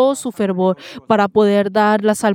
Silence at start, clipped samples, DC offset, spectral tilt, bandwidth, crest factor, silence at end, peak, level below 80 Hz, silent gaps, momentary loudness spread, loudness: 0 s; under 0.1%; under 0.1%; -5.5 dB/octave; 16 kHz; 14 dB; 0 s; 0 dBFS; -62 dBFS; none; 7 LU; -16 LUFS